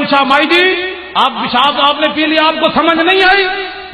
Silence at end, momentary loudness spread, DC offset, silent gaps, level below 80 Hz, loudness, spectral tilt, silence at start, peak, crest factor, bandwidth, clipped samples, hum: 0 s; 7 LU; under 0.1%; none; -44 dBFS; -10 LUFS; -4 dB/octave; 0 s; 0 dBFS; 12 dB; 12.5 kHz; under 0.1%; none